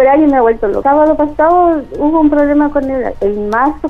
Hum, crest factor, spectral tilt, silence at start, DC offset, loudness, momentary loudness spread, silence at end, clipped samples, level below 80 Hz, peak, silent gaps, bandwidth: none; 10 dB; -8.5 dB/octave; 0 s; under 0.1%; -11 LUFS; 7 LU; 0 s; under 0.1%; -32 dBFS; -2 dBFS; none; 6 kHz